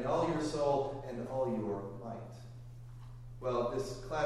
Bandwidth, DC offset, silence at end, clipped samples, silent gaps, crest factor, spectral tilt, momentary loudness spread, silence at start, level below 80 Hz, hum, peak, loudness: 13 kHz; under 0.1%; 0 s; under 0.1%; none; 16 dB; -6.5 dB/octave; 18 LU; 0 s; -54 dBFS; none; -20 dBFS; -36 LUFS